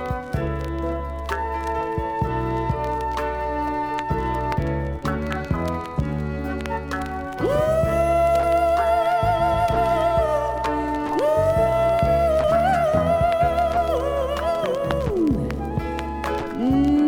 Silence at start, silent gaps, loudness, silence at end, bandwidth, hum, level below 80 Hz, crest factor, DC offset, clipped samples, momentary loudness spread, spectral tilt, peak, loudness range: 0 s; none; -22 LUFS; 0 s; 17.5 kHz; none; -34 dBFS; 16 dB; under 0.1%; under 0.1%; 8 LU; -7 dB/octave; -6 dBFS; 6 LU